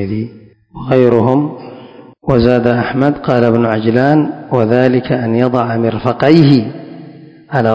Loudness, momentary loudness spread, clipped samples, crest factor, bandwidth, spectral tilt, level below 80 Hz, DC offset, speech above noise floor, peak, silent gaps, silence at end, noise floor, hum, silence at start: -12 LUFS; 16 LU; 1%; 12 dB; 8 kHz; -9 dB/octave; -40 dBFS; under 0.1%; 25 dB; 0 dBFS; none; 0 s; -36 dBFS; none; 0 s